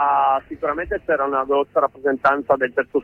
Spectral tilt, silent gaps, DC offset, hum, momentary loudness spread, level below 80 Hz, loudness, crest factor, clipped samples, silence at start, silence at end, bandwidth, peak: -7 dB/octave; none; under 0.1%; none; 6 LU; -48 dBFS; -20 LUFS; 16 dB; under 0.1%; 0 s; 0 s; 6 kHz; -4 dBFS